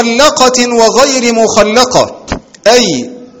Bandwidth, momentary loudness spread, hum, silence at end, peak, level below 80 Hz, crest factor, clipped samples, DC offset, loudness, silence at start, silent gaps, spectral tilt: over 20 kHz; 11 LU; none; 0.15 s; 0 dBFS; -36 dBFS; 8 dB; 2%; under 0.1%; -8 LUFS; 0 s; none; -2.5 dB/octave